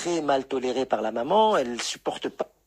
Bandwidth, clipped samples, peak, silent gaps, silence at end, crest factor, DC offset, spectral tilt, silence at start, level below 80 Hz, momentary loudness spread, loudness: 15 kHz; under 0.1%; -10 dBFS; none; 0.2 s; 16 dB; under 0.1%; -3.5 dB/octave; 0 s; -64 dBFS; 10 LU; -25 LUFS